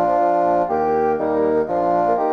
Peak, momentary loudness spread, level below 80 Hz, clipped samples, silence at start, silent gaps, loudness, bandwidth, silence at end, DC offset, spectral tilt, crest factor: -6 dBFS; 2 LU; -50 dBFS; under 0.1%; 0 s; none; -18 LUFS; 6.8 kHz; 0 s; under 0.1%; -8.5 dB/octave; 12 dB